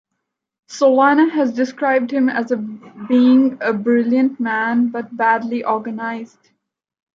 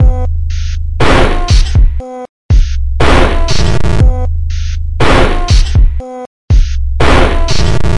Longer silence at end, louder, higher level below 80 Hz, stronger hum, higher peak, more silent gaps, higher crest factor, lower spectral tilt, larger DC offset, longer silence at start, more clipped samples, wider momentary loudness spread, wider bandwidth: first, 0.9 s vs 0 s; second, -17 LUFS vs -12 LUFS; second, -72 dBFS vs -10 dBFS; neither; about the same, -2 dBFS vs 0 dBFS; second, none vs 2.29-2.49 s, 6.26-6.48 s; first, 14 dB vs 8 dB; about the same, -6 dB/octave vs -5.5 dB/octave; neither; first, 0.7 s vs 0 s; second, under 0.1% vs 0.5%; first, 12 LU vs 9 LU; second, 7.4 kHz vs 11 kHz